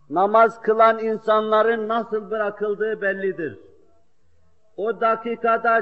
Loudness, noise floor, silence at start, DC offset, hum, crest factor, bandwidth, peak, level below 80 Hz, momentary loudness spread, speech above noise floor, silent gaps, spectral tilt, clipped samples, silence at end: -21 LUFS; -64 dBFS; 0.1 s; 0.2%; none; 16 dB; 7.8 kHz; -4 dBFS; -70 dBFS; 10 LU; 44 dB; none; -3 dB/octave; under 0.1%; 0 s